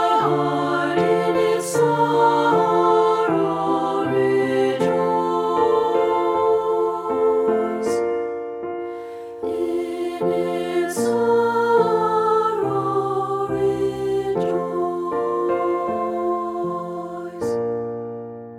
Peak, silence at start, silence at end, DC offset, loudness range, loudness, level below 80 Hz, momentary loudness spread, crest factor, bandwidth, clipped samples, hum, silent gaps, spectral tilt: -6 dBFS; 0 s; 0 s; under 0.1%; 6 LU; -21 LUFS; -58 dBFS; 10 LU; 16 dB; 14.5 kHz; under 0.1%; none; none; -6 dB/octave